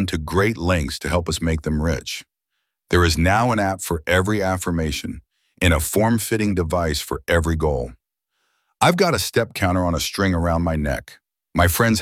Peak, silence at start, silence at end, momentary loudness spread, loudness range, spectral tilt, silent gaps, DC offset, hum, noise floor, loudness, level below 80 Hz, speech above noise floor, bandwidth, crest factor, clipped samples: 0 dBFS; 0 s; 0 s; 9 LU; 1 LU; -5 dB/octave; none; under 0.1%; none; -78 dBFS; -20 LUFS; -34 dBFS; 58 dB; 16.5 kHz; 20 dB; under 0.1%